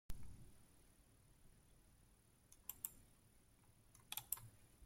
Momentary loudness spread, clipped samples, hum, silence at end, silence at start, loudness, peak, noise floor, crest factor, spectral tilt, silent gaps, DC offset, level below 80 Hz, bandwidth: 22 LU; under 0.1%; none; 0 s; 0.1 s; -51 LUFS; -24 dBFS; -72 dBFS; 32 dB; -1.5 dB/octave; none; under 0.1%; -68 dBFS; 16.5 kHz